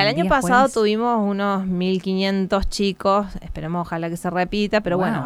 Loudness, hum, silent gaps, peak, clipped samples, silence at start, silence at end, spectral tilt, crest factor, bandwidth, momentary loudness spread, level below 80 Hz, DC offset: -20 LUFS; none; none; -4 dBFS; under 0.1%; 0 s; 0 s; -5.5 dB/octave; 18 dB; 14.5 kHz; 9 LU; -38 dBFS; under 0.1%